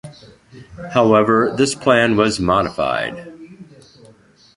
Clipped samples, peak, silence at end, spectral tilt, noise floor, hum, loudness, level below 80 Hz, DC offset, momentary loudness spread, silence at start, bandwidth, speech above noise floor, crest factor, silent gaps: under 0.1%; -2 dBFS; 0.95 s; -5 dB/octave; -49 dBFS; none; -16 LUFS; -46 dBFS; under 0.1%; 16 LU; 0.05 s; 11.5 kHz; 33 dB; 18 dB; none